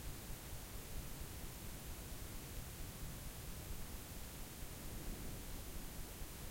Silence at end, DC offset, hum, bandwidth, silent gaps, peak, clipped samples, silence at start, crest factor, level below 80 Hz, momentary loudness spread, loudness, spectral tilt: 0 s; under 0.1%; none; 16.5 kHz; none; -34 dBFS; under 0.1%; 0 s; 14 dB; -52 dBFS; 1 LU; -50 LUFS; -4 dB/octave